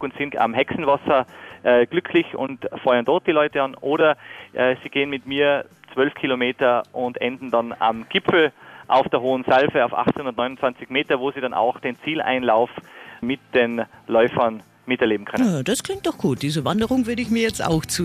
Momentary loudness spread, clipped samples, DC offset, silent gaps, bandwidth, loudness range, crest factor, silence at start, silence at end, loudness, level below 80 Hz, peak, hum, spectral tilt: 8 LU; under 0.1%; under 0.1%; none; 15.5 kHz; 2 LU; 16 dB; 0 s; 0 s; -21 LUFS; -54 dBFS; -6 dBFS; none; -5 dB/octave